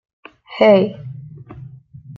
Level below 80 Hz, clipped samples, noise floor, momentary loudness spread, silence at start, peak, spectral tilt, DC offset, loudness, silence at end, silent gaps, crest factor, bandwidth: -58 dBFS; under 0.1%; -39 dBFS; 25 LU; 0.5 s; -2 dBFS; -8 dB/octave; under 0.1%; -14 LUFS; 0.05 s; none; 18 dB; 6 kHz